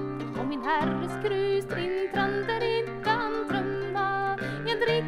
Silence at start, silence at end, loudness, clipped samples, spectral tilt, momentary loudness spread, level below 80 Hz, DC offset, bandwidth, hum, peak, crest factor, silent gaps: 0 s; 0 s; -28 LUFS; under 0.1%; -6 dB/octave; 4 LU; -54 dBFS; under 0.1%; 13.5 kHz; none; -12 dBFS; 16 dB; none